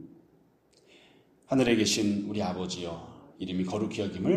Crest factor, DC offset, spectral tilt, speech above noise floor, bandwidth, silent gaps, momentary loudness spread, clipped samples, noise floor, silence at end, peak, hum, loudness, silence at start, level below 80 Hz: 20 dB; under 0.1%; -4.5 dB/octave; 35 dB; 15 kHz; none; 15 LU; under 0.1%; -64 dBFS; 0 s; -10 dBFS; none; -29 LUFS; 0 s; -62 dBFS